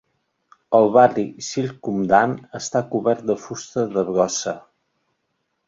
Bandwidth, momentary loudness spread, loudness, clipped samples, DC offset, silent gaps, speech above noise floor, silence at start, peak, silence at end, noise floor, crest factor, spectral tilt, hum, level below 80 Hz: 7.8 kHz; 11 LU; -20 LUFS; under 0.1%; under 0.1%; none; 54 dB; 0.7 s; -2 dBFS; 1.1 s; -73 dBFS; 20 dB; -5 dB/octave; none; -62 dBFS